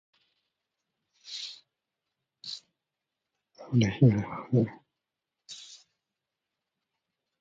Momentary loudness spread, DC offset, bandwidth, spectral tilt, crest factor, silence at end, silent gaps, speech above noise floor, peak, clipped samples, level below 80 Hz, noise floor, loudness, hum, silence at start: 22 LU; under 0.1%; 7.8 kHz; -7 dB/octave; 24 dB; 1.65 s; none; 63 dB; -10 dBFS; under 0.1%; -62 dBFS; -87 dBFS; -28 LUFS; none; 1.25 s